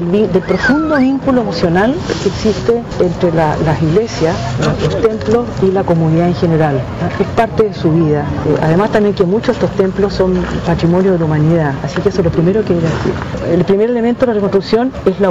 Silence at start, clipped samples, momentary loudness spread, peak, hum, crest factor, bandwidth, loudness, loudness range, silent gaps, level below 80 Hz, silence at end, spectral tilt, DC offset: 0 s; under 0.1%; 4 LU; -2 dBFS; none; 10 dB; 7.8 kHz; -13 LUFS; 1 LU; none; -32 dBFS; 0 s; -7.5 dB/octave; 0.5%